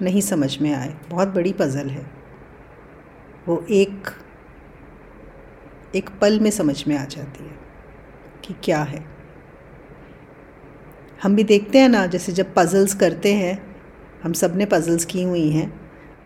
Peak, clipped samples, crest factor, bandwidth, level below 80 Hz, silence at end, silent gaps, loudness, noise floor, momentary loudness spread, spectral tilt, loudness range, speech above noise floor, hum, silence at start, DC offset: 0 dBFS; under 0.1%; 20 dB; 16.5 kHz; -50 dBFS; 0.1 s; none; -20 LUFS; -44 dBFS; 19 LU; -5.5 dB/octave; 11 LU; 25 dB; none; 0 s; under 0.1%